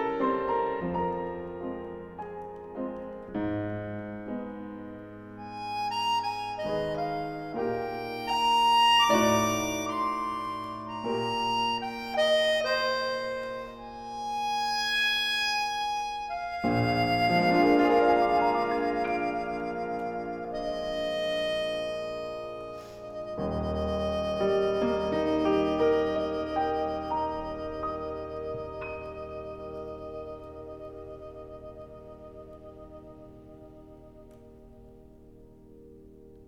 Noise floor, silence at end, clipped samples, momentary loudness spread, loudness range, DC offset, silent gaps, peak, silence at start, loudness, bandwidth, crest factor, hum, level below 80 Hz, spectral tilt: -52 dBFS; 0 s; under 0.1%; 19 LU; 16 LU; under 0.1%; none; -12 dBFS; 0 s; -28 LUFS; 17 kHz; 18 dB; none; -52 dBFS; -4.5 dB/octave